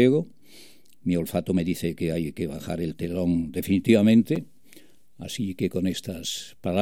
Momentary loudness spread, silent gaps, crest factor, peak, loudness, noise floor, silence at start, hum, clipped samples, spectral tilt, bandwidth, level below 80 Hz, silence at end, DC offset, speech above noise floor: 12 LU; none; 20 dB; -6 dBFS; -25 LUFS; -55 dBFS; 0 s; none; under 0.1%; -6.5 dB/octave; 17 kHz; -52 dBFS; 0 s; 0.4%; 31 dB